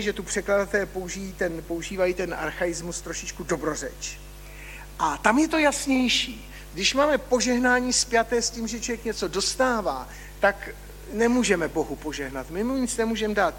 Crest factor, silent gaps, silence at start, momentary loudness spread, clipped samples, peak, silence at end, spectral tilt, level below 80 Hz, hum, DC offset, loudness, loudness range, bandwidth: 22 dB; none; 0 s; 14 LU; under 0.1%; -4 dBFS; 0 s; -3 dB/octave; -44 dBFS; 50 Hz at -45 dBFS; under 0.1%; -25 LUFS; 7 LU; 17 kHz